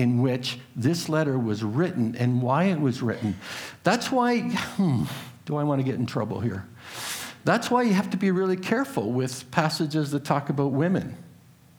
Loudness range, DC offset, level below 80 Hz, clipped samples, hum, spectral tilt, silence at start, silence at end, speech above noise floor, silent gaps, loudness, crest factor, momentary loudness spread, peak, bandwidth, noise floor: 2 LU; under 0.1%; -64 dBFS; under 0.1%; none; -6 dB/octave; 0 s; 0.45 s; 28 dB; none; -26 LUFS; 20 dB; 9 LU; -4 dBFS; over 20 kHz; -52 dBFS